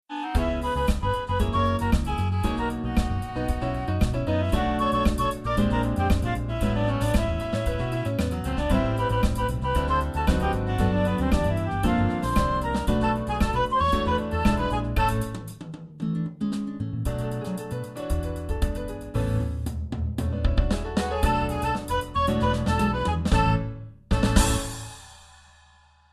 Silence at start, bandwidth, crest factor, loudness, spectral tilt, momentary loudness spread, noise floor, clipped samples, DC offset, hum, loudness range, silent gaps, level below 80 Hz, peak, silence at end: 0.1 s; 14 kHz; 22 dB; -26 LUFS; -6 dB/octave; 7 LU; -57 dBFS; under 0.1%; under 0.1%; none; 5 LU; none; -30 dBFS; -4 dBFS; 0.9 s